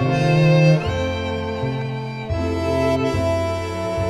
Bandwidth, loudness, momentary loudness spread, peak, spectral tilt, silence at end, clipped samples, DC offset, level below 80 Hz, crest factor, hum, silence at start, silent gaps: 11 kHz; -20 LUFS; 10 LU; -4 dBFS; -7 dB/octave; 0 s; under 0.1%; under 0.1%; -38 dBFS; 16 dB; none; 0 s; none